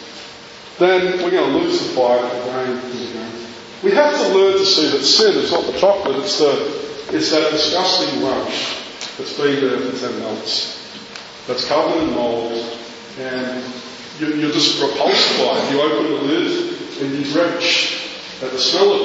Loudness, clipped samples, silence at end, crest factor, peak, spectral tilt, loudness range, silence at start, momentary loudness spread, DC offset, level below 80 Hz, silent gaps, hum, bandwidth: -17 LUFS; under 0.1%; 0 s; 18 dB; 0 dBFS; -3 dB/octave; 7 LU; 0 s; 16 LU; under 0.1%; -58 dBFS; none; none; 8 kHz